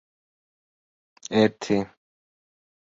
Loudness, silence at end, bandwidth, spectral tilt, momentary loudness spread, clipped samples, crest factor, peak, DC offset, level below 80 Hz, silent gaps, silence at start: -24 LUFS; 1 s; 7.8 kHz; -5.5 dB/octave; 17 LU; under 0.1%; 24 dB; -6 dBFS; under 0.1%; -64 dBFS; none; 1.3 s